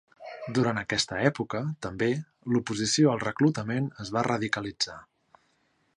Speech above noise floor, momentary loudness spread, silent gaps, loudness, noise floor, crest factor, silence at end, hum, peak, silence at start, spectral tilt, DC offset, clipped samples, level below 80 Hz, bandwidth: 43 dB; 9 LU; none; -28 LUFS; -70 dBFS; 20 dB; 0.95 s; none; -8 dBFS; 0.2 s; -4.5 dB/octave; under 0.1%; under 0.1%; -60 dBFS; 11 kHz